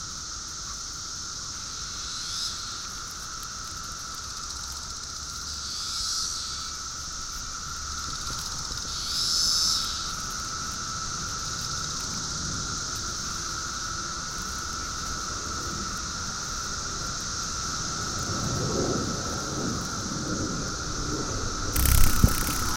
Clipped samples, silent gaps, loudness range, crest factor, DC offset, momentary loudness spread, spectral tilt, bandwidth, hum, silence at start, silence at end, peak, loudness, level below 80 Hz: under 0.1%; none; 6 LU; 24 dB; under 0.1%; 10 LU; -2.5 dB/octave; 17 kHz; none; 0 s; 0 s; -6 dBFS; -29 LUFS; -36 dBFS